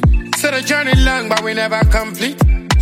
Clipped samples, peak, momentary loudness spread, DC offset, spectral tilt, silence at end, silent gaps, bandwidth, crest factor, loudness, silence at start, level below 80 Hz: under 0.1%; 0 dBFS; 4 LU; under 0.1%; -4.5 dB/octave; 0 s; none; 16 kHz; 14 dB; -15 LUFS; 0 s; -18 dBFS